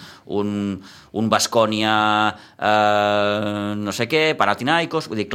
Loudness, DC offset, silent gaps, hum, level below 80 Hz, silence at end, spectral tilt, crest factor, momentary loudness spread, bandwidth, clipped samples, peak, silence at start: -20 LUFS; under 0.1%; none; none; -62 dBFS; 0 s; -4 dB/octave; 20 dB; 9 LU; 16 kHz; under 0.1%; 0 dBFS; 0 s